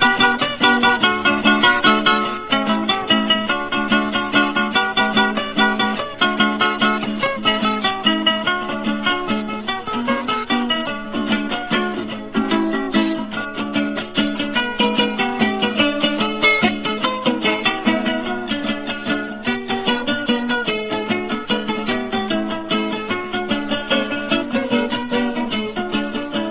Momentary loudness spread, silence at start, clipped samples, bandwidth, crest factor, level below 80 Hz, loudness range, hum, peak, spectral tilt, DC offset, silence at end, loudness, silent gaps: 8 LU; 0 s; under 0.1%; 4 kHz; 18 dB; -52 dBFS; 5 LU; none; 0 dBFS; -8 dB/octave; under 0.1%; 0 s; -18 LUFS; none